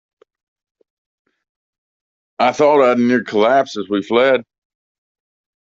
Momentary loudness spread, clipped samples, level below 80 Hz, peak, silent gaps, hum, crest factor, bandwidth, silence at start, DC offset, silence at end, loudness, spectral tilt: 7 LU; under 0.1%; -66 dBFS; 0 dBFS; none; none; 18 dB; 7.6 kHz; 2.4 s; under 0.1%; 1.25 s; -15 LUFS; -5.5 dB/octave